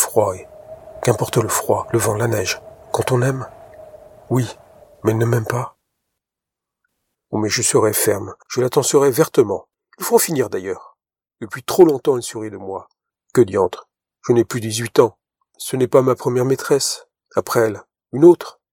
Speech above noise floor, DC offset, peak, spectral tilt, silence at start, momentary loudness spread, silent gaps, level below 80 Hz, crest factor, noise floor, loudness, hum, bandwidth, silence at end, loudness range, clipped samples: 68 dB; under 0.1%; 0 dBFS; -5 dB/octave; 0 s; 16 LU; none; -58 dBFS; 18 dB; -85 dBFS; -18 LUFS; none; 17.5 kHz; 0.2 s; 5 LU; under 0.1%